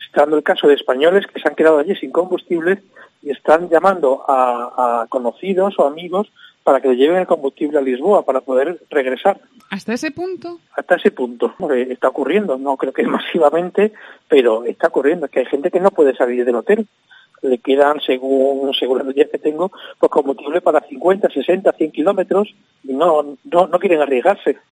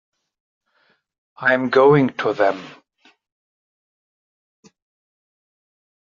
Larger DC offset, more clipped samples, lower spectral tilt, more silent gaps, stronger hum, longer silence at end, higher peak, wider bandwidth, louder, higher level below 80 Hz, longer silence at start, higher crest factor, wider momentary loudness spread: neither; neither; about the same, -6 dB/octave vs -5 dB/octave; neither; neither; second, 0.2 s vs 3.4 s; about the same, 0 dBFS vs -2 dBFS; first, 10.5 kHz vs 7.2 kHz; about the same, -16 LUFS vs -17 LUFS; about the same, -68 dBFS vs -66 dBFS; second, 0 s vs 1.4 s; about the same, 16 dB vs 20 dB; about the same, 8 LU vs 8 LU